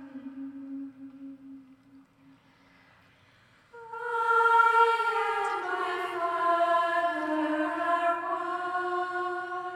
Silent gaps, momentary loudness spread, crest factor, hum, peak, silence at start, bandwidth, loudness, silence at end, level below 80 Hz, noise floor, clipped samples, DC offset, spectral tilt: none; 21 LU; 20 dB; none; -10 dBFS; 0 s; 14.5 kHz; -27 LUFS; 0 s; -78 dBFS; -61 dBFS; under 0.1%; under 0.1%; -3.5 dB/octave